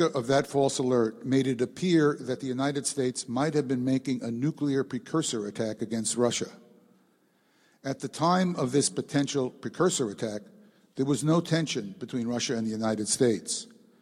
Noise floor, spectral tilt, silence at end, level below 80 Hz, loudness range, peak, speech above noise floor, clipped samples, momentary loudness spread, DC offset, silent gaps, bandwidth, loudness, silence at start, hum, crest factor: -67 dBFS; -5 dB/octave; 0.35 s; -70 dBFS; 3 LU; -12 dBFS; 39 dB; under 0.1%; 9 LU; under 0.1%; none; 15 kHz; -28 LUFS; 0 s; none; 16 dB